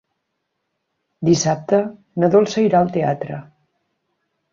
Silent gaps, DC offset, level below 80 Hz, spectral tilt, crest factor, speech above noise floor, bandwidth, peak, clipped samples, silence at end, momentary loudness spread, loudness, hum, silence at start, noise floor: none; under 0.1%; -58 dBFS; -6 dB/octave; 18 dB; 58 dB; 7.6 kHz; -2 dBFS; under 0.1%; 1.1 s; 12 LU; -18 LUFS; none; 1.2 s; -75 dBFS